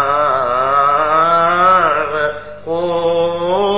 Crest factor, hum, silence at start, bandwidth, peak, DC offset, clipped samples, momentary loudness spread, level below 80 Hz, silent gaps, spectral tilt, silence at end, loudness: 12 dB; 50 Hz at -45 dBFS; 0 s; 4 kHz; -2 dBFS; 1%; under 0.1%; 9 LU; -46 dBFS; none; -8 dB/octave; 0 s; -14 LUFS